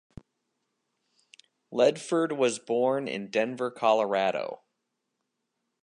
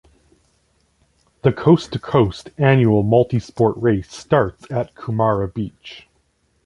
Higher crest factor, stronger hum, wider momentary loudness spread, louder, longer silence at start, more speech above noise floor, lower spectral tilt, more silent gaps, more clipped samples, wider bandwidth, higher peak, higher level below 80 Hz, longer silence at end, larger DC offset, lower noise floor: about the same, 20 dB vs 18 dB; neither; about the same, 10 LU vs 11 LU; second, -27 LUFS vs -18 LUFS; first, 1.7 s vs 1.45 s; first, 55 dB vs 46 dB; second, -4.5 dB/octave vs -8 dB/octave; neither; neither; about the same, 11 kHz vs 11 kHz; second, -10 dBFS vs -2 dBFS; second, -72 dBFS vs -46 dBFS; first, 1.3 s vs 0.65 s; neither; first, -81 dBFS vs -64 dBFS